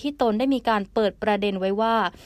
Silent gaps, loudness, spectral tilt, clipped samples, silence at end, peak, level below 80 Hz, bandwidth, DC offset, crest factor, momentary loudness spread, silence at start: none; -23 LUFS; -6.5 dB/octave; under 0.1%; 0.15 s; -8 dBFS; -52 dBFS; 14.5 kHz; under 0.1%; 14 dB; 2 LU; 0 s